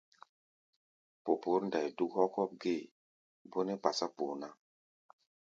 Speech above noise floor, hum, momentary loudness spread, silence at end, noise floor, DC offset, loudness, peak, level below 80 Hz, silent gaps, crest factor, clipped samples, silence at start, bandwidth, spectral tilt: over 55 dB; none; 12 LU; 0.9 s; under -90 dBFS; under 0.1%; -36 LUFS; -12 dBFS; -84 dBFS; 2.91-3.45 s; 26 dB; under 0.1%; 1.25 s; 7.6 kHz; -4 dB/octave